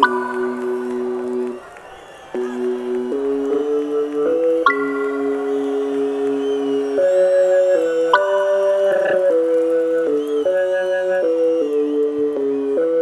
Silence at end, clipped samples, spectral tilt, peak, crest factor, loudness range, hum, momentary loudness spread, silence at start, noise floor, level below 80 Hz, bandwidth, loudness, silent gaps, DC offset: 0 s; under 0.1%; -4.5 dB/octave; -2 dBFS; 16 dB; 7 LU; none; 8 LU; 0 s; -38 dBFS; -64 dBFS; 12 kHz; -18 LUFS; none; under 0.1%